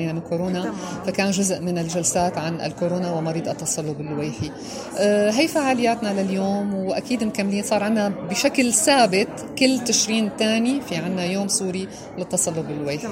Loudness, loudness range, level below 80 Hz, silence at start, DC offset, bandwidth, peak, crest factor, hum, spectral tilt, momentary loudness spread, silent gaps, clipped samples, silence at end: -22 LUFS; 4 LU; -56 dBFS; 0 s; under 0.1%; 16 kHz; -4 dBFS; 18 dB; none; -4 dB/octave; 10 LU; none; under 0.1%; 0 s